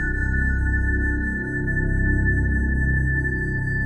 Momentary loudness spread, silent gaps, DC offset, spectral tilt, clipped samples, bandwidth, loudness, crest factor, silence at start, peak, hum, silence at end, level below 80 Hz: 3 LU; none; under 0.1%; -9.5 dB/octave; under 0.1%; 8.4 kHz; -23 LUFS; 12 dB; 0 s; -10 dBFS; none; 0 s; -24 dBFS